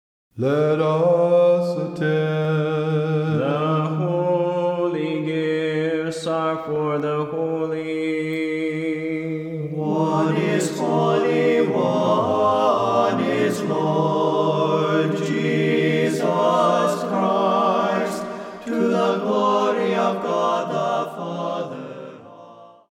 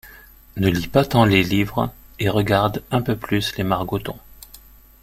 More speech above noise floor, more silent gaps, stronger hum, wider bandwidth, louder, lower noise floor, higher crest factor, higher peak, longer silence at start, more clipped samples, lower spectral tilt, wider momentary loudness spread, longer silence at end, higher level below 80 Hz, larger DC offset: about the same, 26 dB vs 27 dB; neither; neither; second, 14.5 kHz vs 16.5 kHz; about the same, -21 LUFS vs -20 LUFS; about the same, -44 dBFS vs -46 dBFS; about the same, 14 dB vs 18 dB; second, -6 dBFS vs -2 dBFS; first, 0.35 s vs 0.05 s; neither; about the same, -6.5 dB/octave vs -6 dB/octave; second, 8 LU vs 12 LU; second, 0.25 s vs 0.45 s; second, -68 dBFS vs -42 dBFS; neither